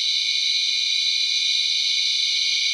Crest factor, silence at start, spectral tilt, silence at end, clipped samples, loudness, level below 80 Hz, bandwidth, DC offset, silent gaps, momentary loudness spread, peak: 12 dB; 0 s; 10 dB/octave; 0 s; under 0.1%; -18 LUFS; under -90 dBFS; 15.5 kHz; under 0.1%; none; 1 LU; -8 dBFS